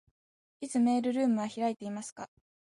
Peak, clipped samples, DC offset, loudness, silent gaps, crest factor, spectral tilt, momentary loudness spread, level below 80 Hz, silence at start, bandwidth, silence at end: -18 dBFS; under 0.1%; under 0.1%; -31 LUFS; 2.12-2.16 s; 14 dB; -5.5 dB/octave; 17 LU; -80 dBFS; 0.6 s; 11.5 kHz; 0.55 s